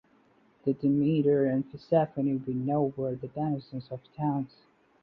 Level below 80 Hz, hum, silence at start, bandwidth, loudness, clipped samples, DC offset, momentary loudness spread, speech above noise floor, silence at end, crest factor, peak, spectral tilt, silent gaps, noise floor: -66 dBFS; none; 0.65 s; 5.4 kHz; -29 LUFS; under 0.1%; under 0.1%; 11 LU; 35 dB; 0.55 s; 18 dB; -12 dBFS; -11.5 dB/octave; none; -64 dBFS